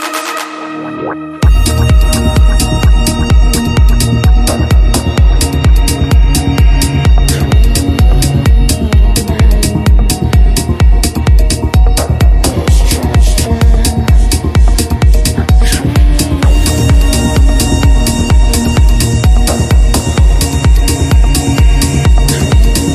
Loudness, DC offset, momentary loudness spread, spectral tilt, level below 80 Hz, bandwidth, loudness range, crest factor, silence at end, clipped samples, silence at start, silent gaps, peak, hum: -10 LUFS; under 0.1%; 2 LU; -5 dB/octave; -8 dBFS; 14.5 kHz; 1 LU; 8 dB; 0 s; under 0.1%; 0 s; none; 0 dBFS; none